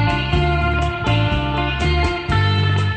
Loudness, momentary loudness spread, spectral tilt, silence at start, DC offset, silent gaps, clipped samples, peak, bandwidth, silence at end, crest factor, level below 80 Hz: -18 LUFS; 3 LU; -6.5 dB/octave; 0 s; under 0.1%; none; under 0.1%; -4 dBFS; 9 kHz; 0 s; 12 dB; -24 dBFS